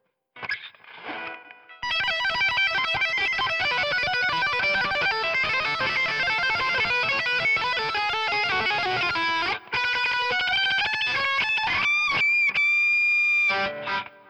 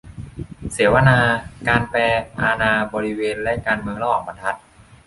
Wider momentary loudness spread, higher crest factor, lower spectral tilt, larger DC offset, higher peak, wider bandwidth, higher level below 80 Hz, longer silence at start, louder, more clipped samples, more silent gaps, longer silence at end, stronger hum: second, 11 LU vs 17 LU; second, 10 dB vs 18 dB; second, -2 dB/octave vs -6 dB/octave; neither; second, -14 dBFS vs -2 dBFS; first, over 20 kHz vs 11.5 kHz; second, -58 dBFS vs -40 dBFS; first, 0.35 s vs 0.05 s; second, -22 LUFS vs -19 LUFS; neither; neither; second, 0.2 s vs 0.5 s; neither